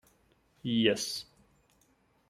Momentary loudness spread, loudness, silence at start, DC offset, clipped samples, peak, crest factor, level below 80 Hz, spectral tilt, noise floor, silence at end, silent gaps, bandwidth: 15 LU; -31 LUFS; 0.65 s; under 0.1%; under 0.1%; -12 dBFS; 24 dB; -70 dBFS; -4 dB/octave; -69 dBFS; 1.05 s; none; 15.5 kHz